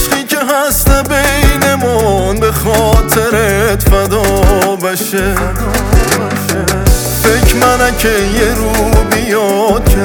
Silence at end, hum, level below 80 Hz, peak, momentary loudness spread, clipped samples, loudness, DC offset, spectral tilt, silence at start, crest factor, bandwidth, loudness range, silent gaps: 0 s; none; -16 dBFS; 0 dBFS; 4 LU; under 0.1%; -11 LUFS; under 0.1%; -4.5 dB/octave; 0 s; 10 dB; over 20 kHz; 1 LU; none